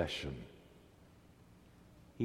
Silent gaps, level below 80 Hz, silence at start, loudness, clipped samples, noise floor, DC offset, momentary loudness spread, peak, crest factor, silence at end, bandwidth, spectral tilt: none; -60 dBFS; 0 s; -44 LUFS; under 0.1%; -62 dBFS; under 0.1%; 21 LU; -20 dBFS; 24 dB; 0 s; 16.5 kHz; -5 dB/octave